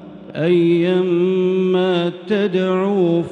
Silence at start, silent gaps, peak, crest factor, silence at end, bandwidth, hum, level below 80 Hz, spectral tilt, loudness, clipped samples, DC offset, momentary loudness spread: 0 s; none; -6 dBFS; 12 dB; 0 s; 6.4 kHz; none; -66 dBFS; -8.5 dB/octave; -17 LUFS; under 0.1%; under 0.1%; 5 LU